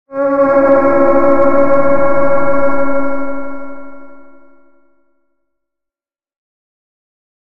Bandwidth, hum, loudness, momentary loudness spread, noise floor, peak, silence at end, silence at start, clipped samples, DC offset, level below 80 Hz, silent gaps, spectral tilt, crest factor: 5 kHz; none; -12 LUFS; 16 LU; -87 dBFS; 0 dBFS; 1.15 s; 0.05 s; under 0.1%; under 0.1%; -40 dBFS; none; -9 dB/octave; 14 dB